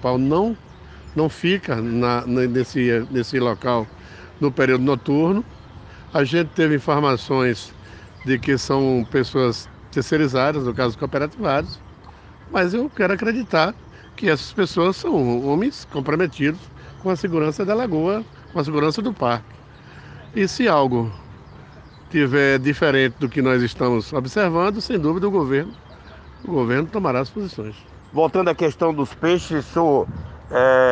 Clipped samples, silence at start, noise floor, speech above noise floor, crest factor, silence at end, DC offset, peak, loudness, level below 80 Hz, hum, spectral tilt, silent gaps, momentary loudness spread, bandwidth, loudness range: under 0.1%; 0 s; -43 dBFS; 24 dB; 18 dB; 0 s; under 0.1%; -2 dBFS; -20 LUFS; -48 dBFS; none; -6.5 dB/octave; none; 11 LU; 9.2 kHz; 3 LU